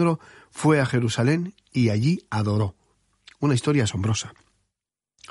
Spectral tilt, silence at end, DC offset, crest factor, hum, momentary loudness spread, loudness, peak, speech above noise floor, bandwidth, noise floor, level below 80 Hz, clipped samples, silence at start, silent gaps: -6 dB/octave; 1 s; under 0.1%; 18 dB; none; 9 LU; -24 LUFS; -6 dBFS; 64 dB; 11.5 kHz; -87 dBFS; -56 dBFS; under 0.1%; 0 s; none